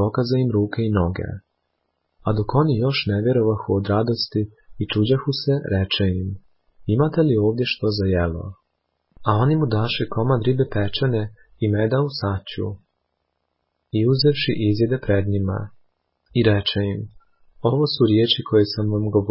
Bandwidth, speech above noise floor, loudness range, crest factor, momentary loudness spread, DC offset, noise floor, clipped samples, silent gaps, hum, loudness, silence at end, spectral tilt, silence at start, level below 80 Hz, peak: 5.8 kHz; 54 dB; 2 LU; 16 dB; 12 LU; under 0.1%; -74 dBFS; under 0.1%; none; none; -21 LUFS; 0 s; -11 dB/octave; 0 s; -40 dBFS; -4 dBFS